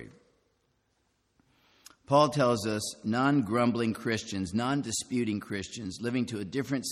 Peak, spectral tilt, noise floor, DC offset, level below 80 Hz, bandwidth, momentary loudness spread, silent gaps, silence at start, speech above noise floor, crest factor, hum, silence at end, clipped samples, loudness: -10 dBFS; -5 dB/octave; -74 dBFS; under 0.1%; -66 dBFS; 14 kHz; 9 LU; none; 0 s; 45 dB; 20 dB; none; 0 s; under 0.1%; -29 LUFS